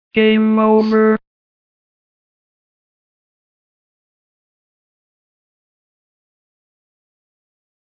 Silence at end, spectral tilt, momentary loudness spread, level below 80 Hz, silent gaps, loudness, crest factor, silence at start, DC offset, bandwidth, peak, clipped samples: 6.7 s; -8.5 dB/octave; 3 LU; -62 dBFS; none; -14 LUFS; 20 dB; 0.15 s; under 0.1%; 5.4 kHz; -2 dBFS; under 0.1%